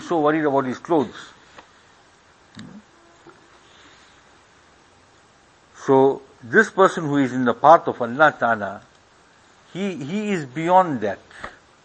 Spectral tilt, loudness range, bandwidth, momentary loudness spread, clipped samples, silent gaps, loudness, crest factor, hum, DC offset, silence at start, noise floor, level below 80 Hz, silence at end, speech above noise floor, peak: -6 dB/octave; 10 LU; 8.8 kHz; 22 LU; under 0.1%; none; -19 LUFS; 22 dB; none; under 0.1%; 0 s; -54 dBFS; -64 dBFS; 0.35 s; 35 dB; 0 dBFS